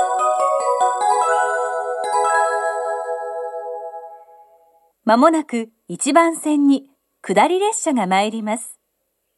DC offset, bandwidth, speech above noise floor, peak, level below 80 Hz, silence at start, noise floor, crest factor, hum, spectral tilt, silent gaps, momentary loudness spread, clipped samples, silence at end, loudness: under 0.1%; 12.5 kHz; 55 dB; 0 dBFS; -78 dBFS; 0 s; -72 dBFS; 18 dB; none; -3.5 dB/octave; none; 13 LU; under 0.1%; 0.65 s; -18 LUFS